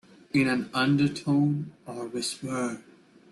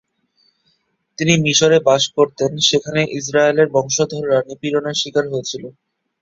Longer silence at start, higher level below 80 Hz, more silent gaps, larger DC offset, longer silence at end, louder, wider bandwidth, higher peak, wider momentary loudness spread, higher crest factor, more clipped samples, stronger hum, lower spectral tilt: second, 0.35 s vs 1.2 s; second, -66 dBFS vs -56 dBFS; neither; neither; about the same, 0.5 s vs 0.5 s; second, -27 LUFS vs -16 LUFS; first, 12.5 kHz vs 7.8 kHz; second, -12 dBFS vs -2 dBFS; first, 12 LU vs 9 LU; about the same, 16 dB vs 16 dB; neither; neither; first, -5.5 dB/octave vs -3.5 dB/octave